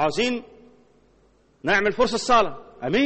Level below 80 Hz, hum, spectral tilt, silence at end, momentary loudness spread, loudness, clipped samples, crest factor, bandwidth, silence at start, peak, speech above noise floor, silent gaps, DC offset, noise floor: -48 dBFS; none; -4 dB/octave; 0 s; 12 LU; -22 LUFS; under 0.1%; 18 dB; 8.8 kHz; 0 s; -6 dBFS; 38 dB; none; under 0.1%; -59 dBFS